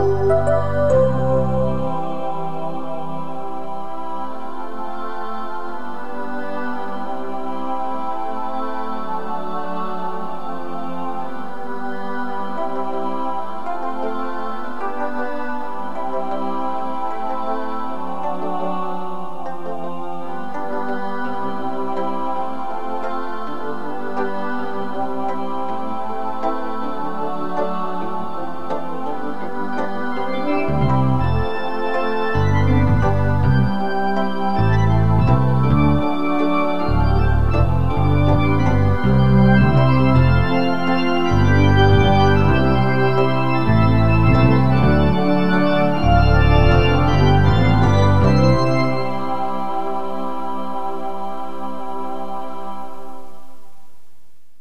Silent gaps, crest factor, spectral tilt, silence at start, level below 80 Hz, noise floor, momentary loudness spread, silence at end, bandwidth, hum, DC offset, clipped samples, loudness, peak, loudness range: none; 18 dB; -8 dB/octave; 0 s; -30 dBFS; -44 dBFS; 14 LU; 0 s; 8.6 kHz; none; 9%; under 0.1%; -20 LUFS; -2 dBFS; 12 LU